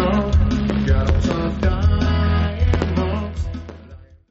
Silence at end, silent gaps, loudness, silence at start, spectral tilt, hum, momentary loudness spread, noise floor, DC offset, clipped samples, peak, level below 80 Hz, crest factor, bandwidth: 0.25 s; none; -20 LUFS; 0 s; -7 dB/octave; none; 9 LU; -42 dBFS; under 0.1%; under 0.1%; -4 dBFS; -22 dBFS; 14 dB; 7.4 kHz